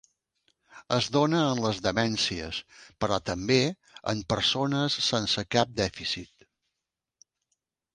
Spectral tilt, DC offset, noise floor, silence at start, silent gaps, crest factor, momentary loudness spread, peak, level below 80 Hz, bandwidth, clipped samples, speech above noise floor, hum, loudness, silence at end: -4.5 dB/octave; under 0.1%; -87 dBFS; 0.75 s; none; 22 dB; 9 LU; -8 dBFS; -54 dBFS; 10.5 kHz; under 0.1%; 59 dB; none; -27 LUFS; 1.7 s